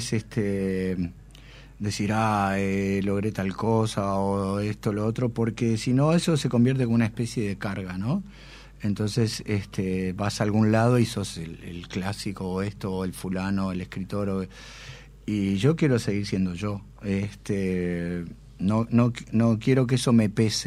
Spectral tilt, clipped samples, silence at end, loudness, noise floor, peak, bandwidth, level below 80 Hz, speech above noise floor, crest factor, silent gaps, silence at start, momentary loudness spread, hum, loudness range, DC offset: -6.5 dB/octave; under 0.1%; 0 s; -26 LUFS; -47 dBFS; -8 dBFS; 14.5 kHz; -50 dBFS; 22 dB; 18 dB; none; 0 s; 11 LU; none; 5 LU; under 0.1%